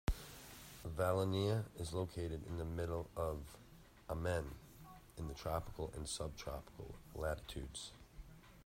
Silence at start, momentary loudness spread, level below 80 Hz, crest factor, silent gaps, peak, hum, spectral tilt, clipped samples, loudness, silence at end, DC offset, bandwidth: 0.05 s; 20 LU; -54 dBFS; 20 dB; none; -24 dBFS; none; -5.5 dB/octave; under 0.1%; -43 LUFS; 0 s; under 0.1%; 16 kHz